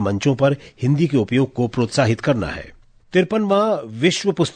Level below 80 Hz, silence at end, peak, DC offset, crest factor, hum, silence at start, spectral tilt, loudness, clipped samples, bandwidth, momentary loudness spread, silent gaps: -48 dBFS; 0.05 s; -4 dBFS; under 0.1%; 16 dB; none; 0 s; -6 dB/octave; -19 LUFS; under 0.1%; 9.4 kHz; 4 LU; none